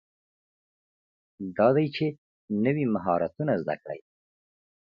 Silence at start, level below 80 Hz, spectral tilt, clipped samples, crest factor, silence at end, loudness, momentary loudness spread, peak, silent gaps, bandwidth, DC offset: 1.4 s; -66 dBFS; -10 dB/octave; under 0.1%; 22 dB; 0.85 s; -27 LUFS; 15 LU; -8 dBFS; 2.18-2.48 s; 5.6 kHz; under 0.1%